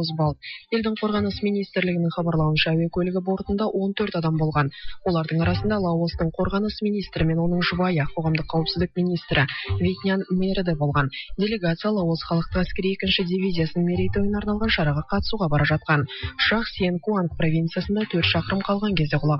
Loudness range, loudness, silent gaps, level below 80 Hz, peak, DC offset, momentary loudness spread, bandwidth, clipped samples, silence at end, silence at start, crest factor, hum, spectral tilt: 1 LU; -23 LUFS; none; -40 dBFS; -6 dBFS; under 0.1%; 4 LU; 5.8 kHz; under 0.1%; 0 s; 0 s; 18 dB; none; -9 dB/octave